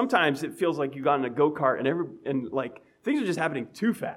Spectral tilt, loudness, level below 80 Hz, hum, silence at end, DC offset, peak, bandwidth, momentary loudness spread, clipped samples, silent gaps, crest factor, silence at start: -6 dB/octave; -27 LUFS; -74 dBFS; none; 0 s; under 0.1%; -8 dBFS; 15.5 kHz; 8 LU; under 0.1%; none; 18 dB; 0 s